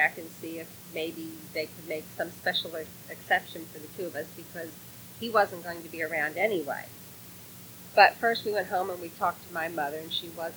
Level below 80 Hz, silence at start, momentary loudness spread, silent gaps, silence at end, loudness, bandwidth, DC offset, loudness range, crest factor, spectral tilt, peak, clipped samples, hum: -70 dBFS; 0 s; 16 LU; none; 0 s; -30 LUFS; over 20 kHz; under 0.1%; 6 LU; 28 dB; -3.5 dB/octave; -4 dBFS; under 0.1%; none